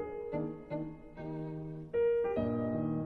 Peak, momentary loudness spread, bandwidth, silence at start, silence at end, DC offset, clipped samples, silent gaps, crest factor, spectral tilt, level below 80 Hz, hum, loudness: -22 dBFS; 12 LU; 4.4 kHz; 0 s; 0 s; under 0.1%; under 0.1%; none; 14 dB; -10.5 dB/octave; -58 dBFS; none; -36 LUFS